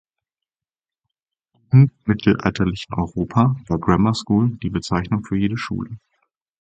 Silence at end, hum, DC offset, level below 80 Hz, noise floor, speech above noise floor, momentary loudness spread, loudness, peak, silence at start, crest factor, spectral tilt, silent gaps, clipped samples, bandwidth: 0.65 s; none; under 0.1%; -42 dBFS; under -90 dBFS; over 71 dB; 10 LU; -20 LUFS; 0 dBFS; 1.7 s; 20 dB; -7.5 dB/octave; none; under 0.1%; 8.6 kHz